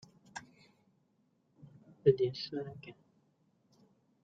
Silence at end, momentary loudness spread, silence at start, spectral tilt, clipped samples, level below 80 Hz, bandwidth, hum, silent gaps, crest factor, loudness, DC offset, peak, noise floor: 1.3 s; 22 LU; 0.35 s; -7 dB/octave; under 0.1%; -74 dBFS; 7.8 kHz; none; none; 26 dB; -33 LUFS; under 0.1%; -12 dBFS; -75 dBFS